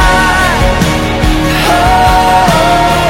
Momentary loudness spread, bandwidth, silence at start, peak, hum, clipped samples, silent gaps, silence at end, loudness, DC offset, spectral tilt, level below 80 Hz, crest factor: 4 LU; 17 kHz; 0 s; 0 dBFS; none; 0.2%; none; 0 s; -8 LUFS; under 0.1%; -4.5 dB/octave; -16 dBFS; 8 dB